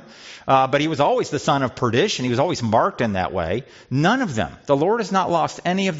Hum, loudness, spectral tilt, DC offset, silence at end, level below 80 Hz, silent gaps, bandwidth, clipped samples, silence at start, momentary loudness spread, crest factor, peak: none; -20 LUFS; -4.5 dB/octave; under 0.1%; 0 s; -54 dBFS; none; 8 kHz; under 0.1%; 0.05 s; 7 LU; 16 dB; -4 dBFS